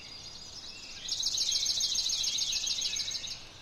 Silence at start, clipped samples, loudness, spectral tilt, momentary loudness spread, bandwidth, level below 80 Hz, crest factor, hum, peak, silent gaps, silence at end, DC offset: 0 s; under 0.1%; -29 LUFS; 1.5 dB/octave; 15 LU; 16 kHz; -56 dBFS; 16 dB; none; -18 dBFS; none; 0 s; under 0.1%